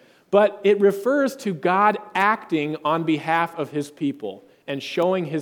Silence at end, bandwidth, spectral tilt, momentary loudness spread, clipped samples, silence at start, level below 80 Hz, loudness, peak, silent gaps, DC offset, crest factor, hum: 0 s; 18 kHz; -6 dB/octave; 10 LU; under 0.1%; 0.3 s; -72 dBFS; -22 LUFS; -4 dBFS; none; under 0.1%; 18 dB; none